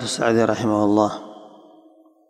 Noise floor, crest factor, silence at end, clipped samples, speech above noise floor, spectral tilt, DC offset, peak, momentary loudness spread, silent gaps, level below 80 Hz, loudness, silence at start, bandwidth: -53 dBFS; 20 dB; 0.8 s; under 0.1%; 34 dB; -5 dB/octave; under 0.1%; -2 dBFS; 15 LU; none; -58 dBFS; -19 LUFS; 0 s; 13 kHz